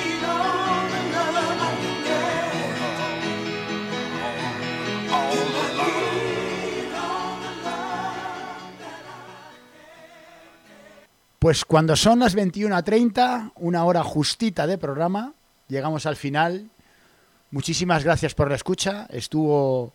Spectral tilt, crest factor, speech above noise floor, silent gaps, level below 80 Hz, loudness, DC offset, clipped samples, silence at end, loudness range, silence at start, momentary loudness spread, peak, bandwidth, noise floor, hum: -5 dB/octave; 20 dB; 37 dB; none; -48 dBFS; -23 LUFS; under 0.1%; under 0.1%; 0.05 s; 11 LU; 0 s; 12 LU; -4 dBFS; 16.5 kHz; -58 dBFS; none